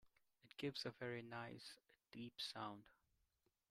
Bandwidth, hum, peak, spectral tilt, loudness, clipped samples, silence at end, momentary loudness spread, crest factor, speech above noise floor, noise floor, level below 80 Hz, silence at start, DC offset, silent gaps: 15.5 kHz; none; -34 dBFS; -4.5 dB/octave; -51 LUFS; under 0.1%; 0.8 s; 14 LU; 20 dB; 35 dB; -86 dBFS; -86 dBFS; 0.05 s; under 0.1%; none